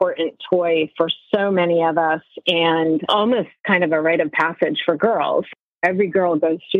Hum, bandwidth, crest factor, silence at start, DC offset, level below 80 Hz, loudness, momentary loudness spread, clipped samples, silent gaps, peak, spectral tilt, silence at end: none; 7 kHz; 16 dB; 0 s; under 0.1%; -70 dBFS; -19 LUFS; 5 LU; under 0.1%; 3.60-3.64 s, 5.61-5.81 s; -4 dBFS; -7 dB/octave; 0 s